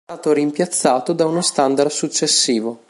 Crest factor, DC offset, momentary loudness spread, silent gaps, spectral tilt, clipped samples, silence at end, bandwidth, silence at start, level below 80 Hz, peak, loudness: 18 dB; under 0.1%; 4 LU; none; -3 dB/octave; under 0.1%; 0.15 s; 11.5 kHz; 0.1 s; -70 dBFS; 0 dBFS; -17 LUFS